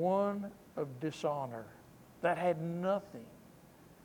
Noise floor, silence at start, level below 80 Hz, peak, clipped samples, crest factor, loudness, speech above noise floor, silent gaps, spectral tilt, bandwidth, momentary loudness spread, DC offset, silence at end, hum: -59 dBFS; 0 s; -72 dBFS; -20 dBFS; under 0.1%; 18 dB; -36 LUFS; 23 dB; none; -7 dB/octave; 19.5 kHz; 19 LU; under 0.1%; 0.1 s; none